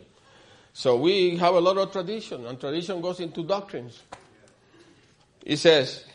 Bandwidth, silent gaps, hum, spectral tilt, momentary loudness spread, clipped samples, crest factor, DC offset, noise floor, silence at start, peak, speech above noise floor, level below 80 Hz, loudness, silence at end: 10.5 kHz; none; none; -5 dB/octave; 19 LU; under 0.1%; 22 dB; under 0.1%; -59 dBFS; 0.75 s; -4 dBFS; 35 dB; -68 dBFS; -24 LUFS; 0.15 s